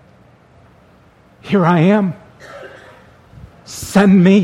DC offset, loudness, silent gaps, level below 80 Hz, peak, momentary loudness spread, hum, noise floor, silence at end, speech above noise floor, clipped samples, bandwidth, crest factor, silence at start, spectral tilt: under 0.1%; -13 LUFS; none; -50 dBFS; 0 dBFS; 26 LU; none; -48 dBFS; 0 s; 37 dB; under 0.1%; 14 kHz; 16 dB; 1.45 s; -7 dB/octave